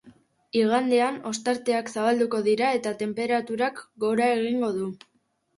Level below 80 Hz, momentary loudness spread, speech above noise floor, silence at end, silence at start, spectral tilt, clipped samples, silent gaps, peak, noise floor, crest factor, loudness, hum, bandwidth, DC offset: -72 dBFS; 7 LU; 31 dB; 0.6 s; 0.05 s; -4.5 dB/octave; under 0.1%; none; -10 dBFS; -56 dBFS; 14 dB; -25 LUFS; none; 11.5 kHz; under 0.1%